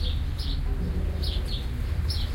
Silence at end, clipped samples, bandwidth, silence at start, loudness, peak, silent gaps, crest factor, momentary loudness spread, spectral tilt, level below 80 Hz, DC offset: 0 s; under 0.1%; 16.5 kHz; 0 s; -30 LUFS; -16 dBFS; none; 12 dB; 2 LU; -6 dB/octave; -28 dBFS; under 0.1%